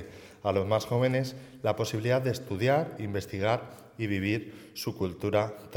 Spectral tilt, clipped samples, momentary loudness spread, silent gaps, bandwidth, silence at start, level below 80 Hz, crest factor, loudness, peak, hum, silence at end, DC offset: -6 dB/octave; under 0.1%; 10 LU; none; 18 kHz; 0 s; -62 dBFS; 18 dB; -30 LUFS; -12 dBFS; none; 0 s; under 0.1%